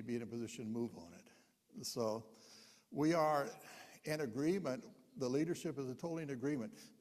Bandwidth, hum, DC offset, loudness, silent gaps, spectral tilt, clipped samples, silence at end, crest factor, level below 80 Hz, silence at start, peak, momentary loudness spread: 15 kHz; none; under 0.1%; -41 LUFS; none; -5.5 dB/octave; under 0.1%; 0.1 s; 18 dB; -80 dBFS; 0 s; -22 dBFS; 21 LU